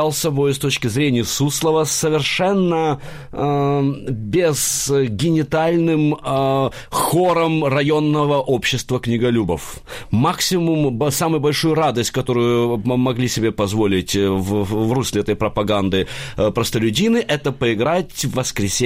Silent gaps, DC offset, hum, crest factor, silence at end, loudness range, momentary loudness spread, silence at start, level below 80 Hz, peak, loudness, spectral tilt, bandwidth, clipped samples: none; under 0.1%; none; 12 dB; 0 s; 1 LU; 4 LU; 0 s; -42 dBFS; -6 dBFS; -18 LUFS; -5 dB/octave; 16 kHz; under 0.1%